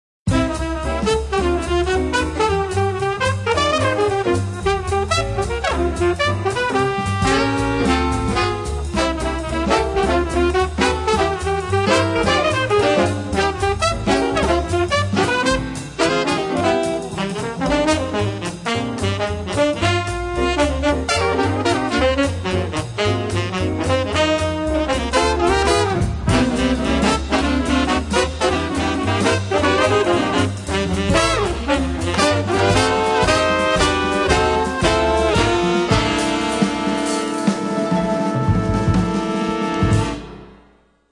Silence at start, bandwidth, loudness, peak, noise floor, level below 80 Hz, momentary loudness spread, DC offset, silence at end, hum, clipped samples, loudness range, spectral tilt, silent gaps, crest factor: 0.25 s; 11.5 kHz; -18 LUFS; 0 dBFS; -54 dBFS; -32 dBFS; 5 LU; under 0.1%; 0.55 s; none; under 0.1%; 3 LU; -5 dB/octave; none; 18 dB